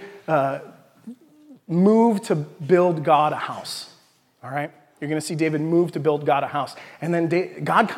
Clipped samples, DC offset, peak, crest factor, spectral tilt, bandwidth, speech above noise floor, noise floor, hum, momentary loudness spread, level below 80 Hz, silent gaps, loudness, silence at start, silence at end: under 0.1%; under 0.1%; -2 dBFS; 20 dB; -6.5 dB/octave; 15.5 kHz; 37 dB; -58 dBFS; none; 14 LU; -76 dBFS; none; -22 LUFS; 0 s; 0 s